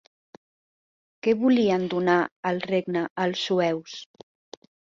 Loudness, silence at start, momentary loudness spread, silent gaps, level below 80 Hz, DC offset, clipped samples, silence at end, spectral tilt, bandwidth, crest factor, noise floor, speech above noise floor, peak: -24 LUFS; 1.25 s; 9 LU; 2.32-2.43 s, 3.10-3.16 s; -70 dBFS; under 0.1%; under 0.1%; 0.9 s; -6 dB/octave; 7.6 kHz; 20 dB; under -90 dBFS; over 66 dB; -6 dBFS